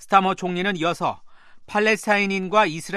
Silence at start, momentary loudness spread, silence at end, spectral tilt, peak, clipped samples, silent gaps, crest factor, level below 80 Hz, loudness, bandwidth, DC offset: 0 s; 8 LU; 0 s; -4.5 dB/octave; -2 dBFS; under 0.1%; none; 20 dB; -60 dBFS; -21 LUFS; 13.5 kHz; under 0.1%